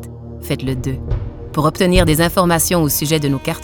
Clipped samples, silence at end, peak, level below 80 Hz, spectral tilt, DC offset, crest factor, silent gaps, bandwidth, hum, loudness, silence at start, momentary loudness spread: under 0.1%; 0 s; 0 dBFS; -28 dBFS; -5 dB/octave; under 0.1%; 16 dB; none; over 20 kHz; none; -16 LUFS; 0 s; 11 LU